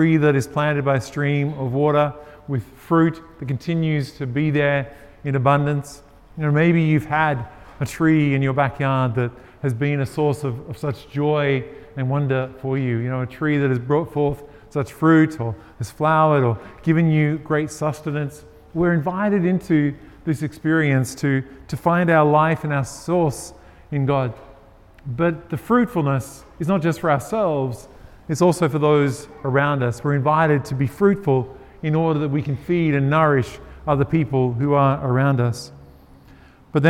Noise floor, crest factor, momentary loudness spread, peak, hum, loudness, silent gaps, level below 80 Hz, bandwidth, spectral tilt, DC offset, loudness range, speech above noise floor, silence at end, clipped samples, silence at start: -47 dBFS; 20 dB; 12 LU; 0 dBFS; none; -20 LUFS; none; -48 dBFS; 14 kHz; -7.5 dB/octave; under 0.1%; 3 LU; 28 dB; 0 s; under 0.1%; 0 s